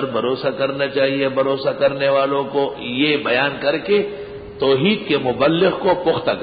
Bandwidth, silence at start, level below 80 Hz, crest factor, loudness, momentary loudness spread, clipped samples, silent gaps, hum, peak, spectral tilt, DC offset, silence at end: 5 kHz; 0 s; -52 dBFS; 14 dB; -18 LUFS; 5 LU; under 0.1%; none; none; -4 dBFS; -10.5 dB/octave; under 0.1%; 0 s